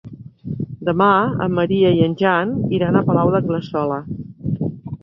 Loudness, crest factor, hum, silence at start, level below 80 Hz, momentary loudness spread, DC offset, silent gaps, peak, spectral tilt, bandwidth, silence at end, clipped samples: -18 LUFS; 16 dB; none; 0.05 s; -48 dBFS; 13 LU; under 0.1%; none; -2 dBFS; -9.5 dB/octave; 6 kHz; 0.05 s; under 0.1%